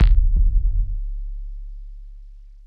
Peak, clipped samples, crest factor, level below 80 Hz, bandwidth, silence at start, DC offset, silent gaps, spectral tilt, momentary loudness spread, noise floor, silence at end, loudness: -6 dBFS; under 0.1%; 14 dB; -20 dBFS; 4.5 kHz; 0 s; under 0.1%; none; -9 dB/octave; 23 LU; -40 dBFS; 0.25 s; -24 LUFS